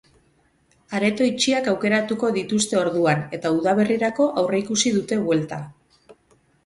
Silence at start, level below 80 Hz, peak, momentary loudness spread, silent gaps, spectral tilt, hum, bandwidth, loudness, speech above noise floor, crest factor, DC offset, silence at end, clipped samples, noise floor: 0.9 s; -60 dBFS; -6 dBFS; 4 LU; none; -4.5 dB/octave; none; 11.5 kHz; -21 LUFS; 41 dB; 16 dB; under 0.1%; 0.55 s; under 0.1%; -62 dBFS